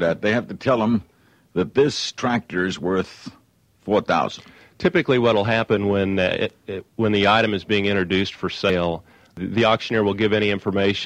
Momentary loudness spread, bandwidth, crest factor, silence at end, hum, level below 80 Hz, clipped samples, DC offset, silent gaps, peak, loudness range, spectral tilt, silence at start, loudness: 10 LU; 10 kHz; 18 dB; 0 s; none; -52 dBFS; under 0.1%; under 0.1%; none; -4 dBFS; 3 LU; -5.5 dB/octave; 0 s; -21 LUFS